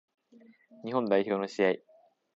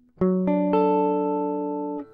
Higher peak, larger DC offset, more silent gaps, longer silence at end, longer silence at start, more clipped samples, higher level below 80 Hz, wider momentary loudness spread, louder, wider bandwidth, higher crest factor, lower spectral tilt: about the same, -12 dBFS vs -10 dBFS; neither; neither; first, 0.6 s vs 0.1 s; first, 0.85 s vs 0.2 s; neither; second, -80 dBFS vs -58 dBFS; about the same, 9 LU vs 8 LU; second, -30 LUFS vs -23 LUFS; first, 8 kHz vs 4.7 kHz; first, 20 dB vs 12 dB; second, -6 dB/octave vs -11.5 dB/octave